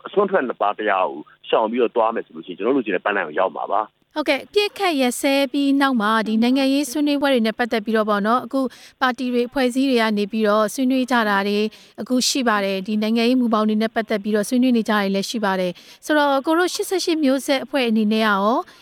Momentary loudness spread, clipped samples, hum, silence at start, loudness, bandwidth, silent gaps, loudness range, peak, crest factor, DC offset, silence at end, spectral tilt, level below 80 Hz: 6 LU; under 0.1%; none; 0.05 s; -20 LUFS; 17.5 kHz; none; 3 LU; -4 dBFS; 16 dB; under 0.1%; 0.2 s; -4 dB/octave; -64 dBFS